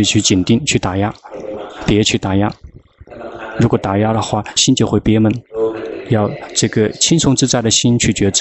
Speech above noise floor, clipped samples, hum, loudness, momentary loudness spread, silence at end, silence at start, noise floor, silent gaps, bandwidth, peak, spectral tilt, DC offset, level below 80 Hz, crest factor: 25 dB; under 0.1%; none; -14 LUFS; 14 LU; 0 s; 0 s; -39 dBFS; none; 8.6 kHz; -2 dBFS; -4 dB/octave; under 0.1%; -38 dBFS; 14 dB